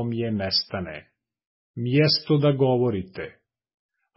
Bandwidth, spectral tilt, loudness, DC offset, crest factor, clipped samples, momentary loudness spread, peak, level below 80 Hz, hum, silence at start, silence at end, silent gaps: 5.8 kHz; -9.5 dB/octave; -23 LUFS; under 0.1%; 16 dB; under 0.1%; 18 LU; -8 dBFS; -54 dBFS; none; 0 s; 0.85 s; 1.47-1.74 s